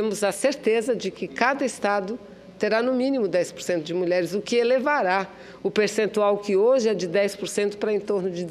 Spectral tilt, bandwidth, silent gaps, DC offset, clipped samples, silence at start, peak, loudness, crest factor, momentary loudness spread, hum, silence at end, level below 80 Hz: -4.5 dB/octave; 14.5 kHz; none; under 0.1%; under 0.1%; 0 s; -6 dBFS; -23 LUFS; 18 dB; 6 LU; none; 0 s; -66 dBFS